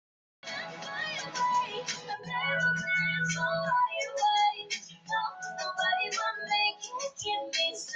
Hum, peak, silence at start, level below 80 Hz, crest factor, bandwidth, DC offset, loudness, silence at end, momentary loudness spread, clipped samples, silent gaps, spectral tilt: none; -16 dBFS; 0.45 s; -72 dBFS; 14 dB; 9.6 kHz; under 0.1%; -30 LUFS; 0 s; 10 LU; under 0.1%; none; -2 dB/octave